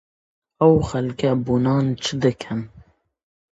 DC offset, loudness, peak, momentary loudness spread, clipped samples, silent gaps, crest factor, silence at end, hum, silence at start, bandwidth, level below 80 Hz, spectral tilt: under 0.1%; -21 LUFS; -2 dBFS; 13 LU; under 0.1%; none; 20 dB; 0.8 s; none; 0.6 s; 8 kHz; -46 dBFS; -7 dB/octave